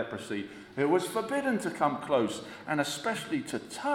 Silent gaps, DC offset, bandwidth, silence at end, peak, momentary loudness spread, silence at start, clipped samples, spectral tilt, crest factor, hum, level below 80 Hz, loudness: none; under 0.1%; 17 kHz; 0 s; -12 dBFS; 10 LU; 0 s; under 0.1%; -4.5 dB/octave; 18 dB; none; -70 dBFS; -31 LUFS